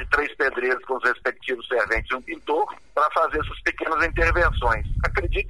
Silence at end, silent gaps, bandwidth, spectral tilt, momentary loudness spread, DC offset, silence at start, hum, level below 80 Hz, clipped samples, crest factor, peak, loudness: 0 s; none; 11.5 kHz; -6 dB/octave; 6 LU; 0.4%; 0 s; none; -32 dBFS; under 0.1%; 18 dB; -4 dBFS; -23 LUFS